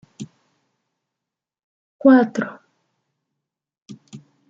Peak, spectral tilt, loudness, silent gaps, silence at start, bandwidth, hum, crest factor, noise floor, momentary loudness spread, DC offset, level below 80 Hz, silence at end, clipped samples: -2 dBFS; -7 dB/octave; -17 LUFS; 1.64-1.99 s; 0.2 s; 7.6 kHz; none; 22 dB; -86 dBFS; 25 LU; under 0.1%; -74 dBFS; 0.3 s; under 0.1%